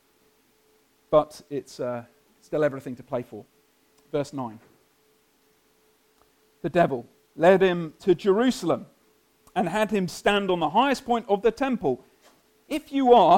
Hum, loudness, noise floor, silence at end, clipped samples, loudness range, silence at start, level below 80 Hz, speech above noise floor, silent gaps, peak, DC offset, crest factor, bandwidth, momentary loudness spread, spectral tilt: none; -25 LUFS; -64 dBFS; 0 s; under 0.1%; 12 LU; 1.1 s; -58 dBFS; 41 dB; none; -4 dBFS; under 0.1%; 20 dB; 16.5 kHz; 15 LU; -6 dB/octave